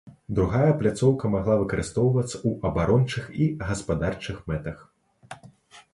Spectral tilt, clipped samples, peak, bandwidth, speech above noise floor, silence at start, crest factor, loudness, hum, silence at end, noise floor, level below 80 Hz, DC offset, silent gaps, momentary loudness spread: -7 dB/octave; under 0.1%; -8 dBFS; 11.5 kHz; 27 dB; 0.05 s; 18 dB; -25 LUFS; none; 0.15 s; -51 dBFS; -42 dBFS; under 0.1%; none; 16 LU